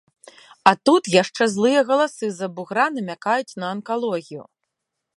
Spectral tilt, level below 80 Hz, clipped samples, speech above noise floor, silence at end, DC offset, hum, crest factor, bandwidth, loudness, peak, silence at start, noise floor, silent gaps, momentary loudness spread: -4.5 dB/octave; -70 dBFS; under 0.1%; 60 dB; 0.75 s; under 0.1%; none; 22 dB; 11.5 kHz; -20 LUFS; 0 dBFS; 0.65 s; -81 dBFS; none; 12 LU